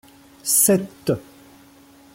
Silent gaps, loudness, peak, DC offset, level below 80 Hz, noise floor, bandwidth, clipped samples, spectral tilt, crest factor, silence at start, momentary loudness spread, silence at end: none; -19 LUFS; -4 dBFS; under 0.1%; -60 dBFS; -49 dBFS; 16.5 kHz; under 0.1%; -3.5 dB/octave; 20 dB; 0.45 s; 13 LU; 0.95 s